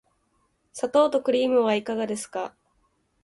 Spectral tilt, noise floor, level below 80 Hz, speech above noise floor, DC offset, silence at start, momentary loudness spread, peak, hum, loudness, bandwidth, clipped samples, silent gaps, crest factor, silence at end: -4 dB/octave; -69 dBFS; -70 dBFS; 46 dB; under 0.1%; 0.75 s; 13 LU; -8 dBFS; none; -24 LUFS; 11.5 kHz; under 0.1%; none; 18 dB; 0.75 s